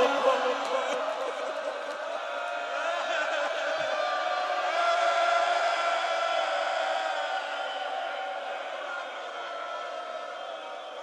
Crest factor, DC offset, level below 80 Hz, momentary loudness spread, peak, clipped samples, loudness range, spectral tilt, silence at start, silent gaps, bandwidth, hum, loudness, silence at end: 18 dB; under 0.1%; under -90 dBFS; 11 LU; -12 dBFS; under 0.1%; 7 LU; -0.5 dB/octave; 0 s; none; 12 kHz; none; -29 LUFS; 0 s